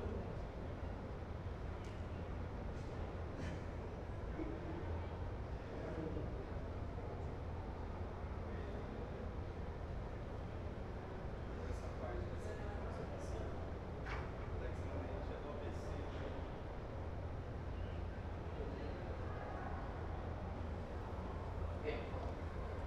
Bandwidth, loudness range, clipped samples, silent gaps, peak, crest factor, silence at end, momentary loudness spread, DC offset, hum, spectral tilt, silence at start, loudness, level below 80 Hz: 10 kHz; 1 LU; under 0.1%; none; -30 dBFS; 14 dB; 0 s; 3 LU; under 0.1%; none; -7.5 dB/octave; 0 s; -47 LUFS; -50 dBFS